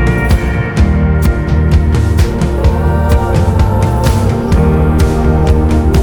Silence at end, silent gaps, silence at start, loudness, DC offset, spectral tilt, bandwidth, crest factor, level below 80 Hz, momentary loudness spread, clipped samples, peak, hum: 0 s; none; 0 s; -12 LUFS; under 0.1%; -7.5 dB/octave; 17.5 kHz; 10 dB; -14 dBFS; 2 LU; under 0.1%; 0 dBFS; none